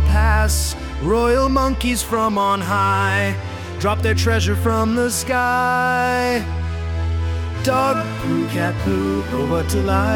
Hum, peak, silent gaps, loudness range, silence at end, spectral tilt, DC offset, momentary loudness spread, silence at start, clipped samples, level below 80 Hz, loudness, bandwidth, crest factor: none; -4 dBFS; none; 2 LU; 0 s; -5 dB/octave; under 0.1%; 6 LU; 0 s; under 0.1%; -26 dBFS; -19 LUFS; 18.5 kHz; 14 dB